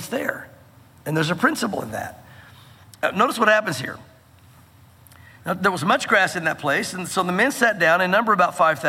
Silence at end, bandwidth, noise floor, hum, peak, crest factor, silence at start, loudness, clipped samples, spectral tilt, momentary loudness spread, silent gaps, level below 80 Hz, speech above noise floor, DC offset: 0 s; 17 kHz; -50 dBFS; none; -4 dBFS; 20 dB; 0 s; -20 LUFS; under 0.1%; -4 dB/octave; 14 LU; none; -62 dBFS; 30 dB; under 0.1%